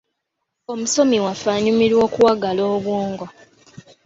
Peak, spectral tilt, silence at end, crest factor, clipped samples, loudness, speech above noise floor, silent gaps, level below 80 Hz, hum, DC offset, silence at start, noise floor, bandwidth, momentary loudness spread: -2 dBFS; -4.5 dB/octave; 0.75 s; 16 dB; under 0.1%; -18 LUFS; 59 dB; none; -56 dBFS; none; under 0.1%; 0.7 s; -77 dBFS; 8 kHz; 12 LU